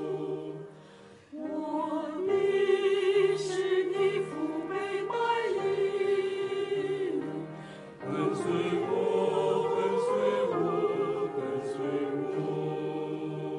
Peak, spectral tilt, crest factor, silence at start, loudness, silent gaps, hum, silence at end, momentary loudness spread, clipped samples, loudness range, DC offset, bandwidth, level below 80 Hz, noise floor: -14 dBFS; -6 dB/octave; 16 dB; 0 s; -30 LUFS; none; none; 0 s; 10 LU; under 0.1%; 3 LU; under 0.1%; 11 kHz; -76 dBFS; -53 dBFS